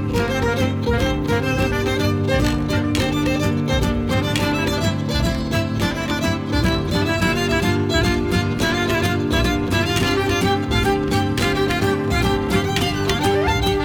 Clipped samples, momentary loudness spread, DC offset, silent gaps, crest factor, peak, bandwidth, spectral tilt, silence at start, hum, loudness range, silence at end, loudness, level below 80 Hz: under 0.1%; 2 LU; under 0.1%; none; 14 dB; -4 dBFS; 19.5 kHz; -5.5 dB/octave; 0 s; none; 1 LU; 0 s; -19 LUFS; -30 dBFS